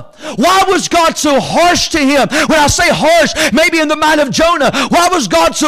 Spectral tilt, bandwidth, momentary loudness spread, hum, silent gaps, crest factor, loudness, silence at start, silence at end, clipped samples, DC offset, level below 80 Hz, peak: -3 dB/octave; 16 kHz; 2 LU; none; none; 8 dB; -10 LUFS; 0 s; 0 s; under 0.1%; under 0.1%; -34 dBFS; -4 dBFS